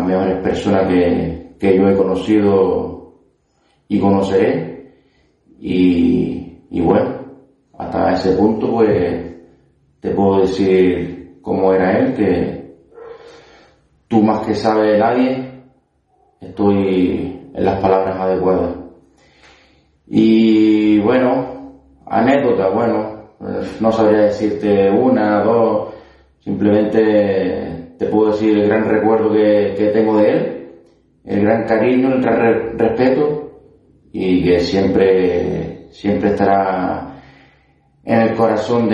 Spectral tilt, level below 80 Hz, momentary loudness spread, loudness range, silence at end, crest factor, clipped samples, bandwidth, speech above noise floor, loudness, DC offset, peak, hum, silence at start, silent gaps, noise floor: -8 dB/octave; -48 dBFS; 13 LU; 3 LU; 0 s; 16 dB; under 0.1%; 8.6 kHz; 46 dB; -15 LUFS; under 0.1%; 0 dBFS; none; 0 s; none; -60 dBFS